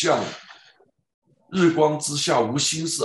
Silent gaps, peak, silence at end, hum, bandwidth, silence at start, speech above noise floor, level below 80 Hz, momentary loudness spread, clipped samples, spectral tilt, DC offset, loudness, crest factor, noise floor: 1.14-1.22 s; -6 dBFS; 0 s; none; 11.5 kHz; 0 s; 37 dB; -64 dBFS; 12 LU; under 0.1%; -3.5 dB/octave; under 0.1%; -22 LUFS; 18 dB; -58 dBFS